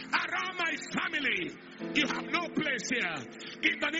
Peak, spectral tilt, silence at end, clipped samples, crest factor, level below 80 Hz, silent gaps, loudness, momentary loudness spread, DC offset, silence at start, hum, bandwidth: -12 dBFS; -1 dB/octave; 0 s; under 0.1%; 20 dB; -70 dBFS; none; -31 LUFS; 7 LU; under 0.1%; 0 s; none; 8 kHz